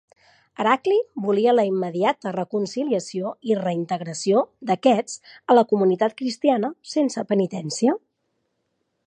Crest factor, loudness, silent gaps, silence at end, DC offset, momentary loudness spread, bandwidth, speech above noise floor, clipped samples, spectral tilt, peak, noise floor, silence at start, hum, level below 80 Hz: 20 dB; -22 LUFS; none; 1.1 s; under 0.1%; 8 LU; 10 kHz; 52 dB; under 0.1%; -5.5 dB/octave; -4 dBFS; -74 dBFS; 0.6 s; none; -76 dBFS